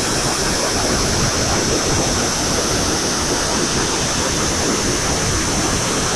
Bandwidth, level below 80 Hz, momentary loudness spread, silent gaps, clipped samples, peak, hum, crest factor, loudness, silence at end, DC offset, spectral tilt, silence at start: 14 kHz; -30 dBFS; 1 LU; none; under 0.1%; -4 dBFS; none; 14 dB; -17 LUFS; 0 s; under 0.1%; -2.5 dB/octave; 0 s